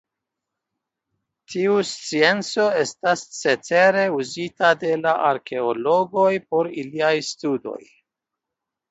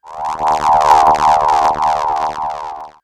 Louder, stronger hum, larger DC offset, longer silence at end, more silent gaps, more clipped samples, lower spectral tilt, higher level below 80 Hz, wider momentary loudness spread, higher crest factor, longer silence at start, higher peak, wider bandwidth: second, -21 LUFS vs -13 LUFS; neither; neither; first, 1.1 s vs 0.15 s; neither; neither; about the same, -4 dB/octave vs -3.5 dB/octave; second, -70 dBFS vs -42 dBFS; second, 9 LU vs 13 LU; first, 20 dB vs 14 dB; first, 1.5 s vs 0.05 s; about the same, -2 dBFS vs 0 dBFS; second, 8.2 kHz vs 14.5 kHz